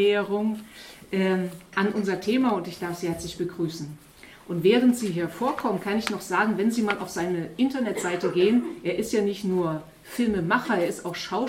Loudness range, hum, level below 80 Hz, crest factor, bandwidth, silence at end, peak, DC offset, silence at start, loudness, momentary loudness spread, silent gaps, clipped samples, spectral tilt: 2 LU; none; -58 dBFS; 18 dB; 16.5 kHz; 0 s; -6 dBFS; under 0.1%; 0 s; -26 LUFS; 10 LU; none; under 0.1%; -5.5 dB/octave